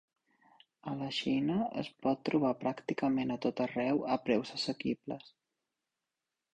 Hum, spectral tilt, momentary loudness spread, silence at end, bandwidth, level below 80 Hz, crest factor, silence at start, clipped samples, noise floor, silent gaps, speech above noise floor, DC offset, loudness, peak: none; -6 dB/octave; 8 LU; 1.25 s; 9.2 kHz; -70 dBFS; 20 dB; 0.85 s; under 0.1%; -89 dBFS; none; 56 dB; under 0.1%; -34 LUFS; -16 dBFS